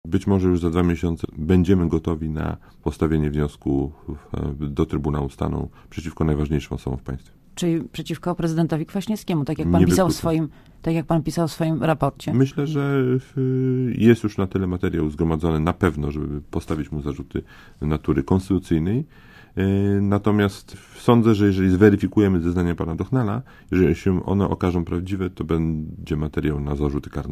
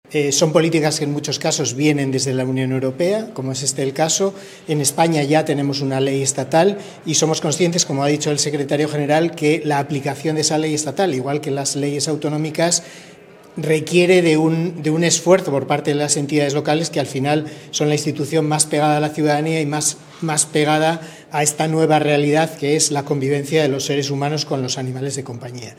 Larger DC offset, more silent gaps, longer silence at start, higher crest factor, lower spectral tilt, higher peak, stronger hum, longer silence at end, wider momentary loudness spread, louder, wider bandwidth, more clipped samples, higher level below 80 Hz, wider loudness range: neither; neither; about the same, 0.05 s vs 0.1 s; about the same, 20 dB vs 18 dB; first, -7.5 dB/octave vs -4 dB/octave; about the same, 0 dBFS vs 0 dBFS; neither; about the same, 0 s vs 0.05 s; first, 12 LU vs 6 LU; second, -22 LUFS vs -18 LUFS; about the same, 15.5 kHz vs 16 kHz; neither; first, -34 dBFS vs -64 dBFS; first, 6 LU vs 3 LU